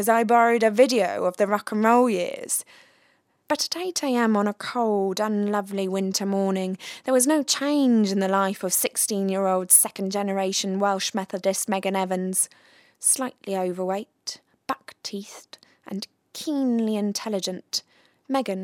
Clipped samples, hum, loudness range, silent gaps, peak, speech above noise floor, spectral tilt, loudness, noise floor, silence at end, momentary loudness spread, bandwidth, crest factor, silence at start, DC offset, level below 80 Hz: under 0.1%; none; 8 LU; none; -4 dBFS; 41 dB; -3.5 dB/octave; -23 LUFS; -64 dBFS; 0 s; 14 LU; 17 kHz; 20 dB; 0 s; under 0.1%; -78 dBFS